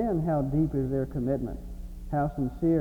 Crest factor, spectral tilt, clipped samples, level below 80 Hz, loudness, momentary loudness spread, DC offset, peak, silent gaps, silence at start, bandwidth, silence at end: 12 dB; -10.5 dB/octave; under 0.1%; -40 dBFS; -29 LUFS; 13 LU; under 0.1%; -16 dBFS; none; 0 s; 19.5 kHz; 0 s